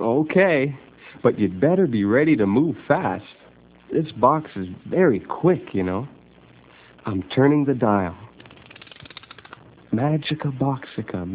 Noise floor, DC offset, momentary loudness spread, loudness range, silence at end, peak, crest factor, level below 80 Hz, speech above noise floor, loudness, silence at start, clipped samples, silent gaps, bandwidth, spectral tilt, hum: -50 dBFS; under 0.1%; 21 LU; 4 LU; 0 s; -2 dBFS; 20 dB; -52 dBFS; 30 dB; -21 LUFS; 0 s; under 0.1%; none; 4 kHz; -11.5 dB/octave; none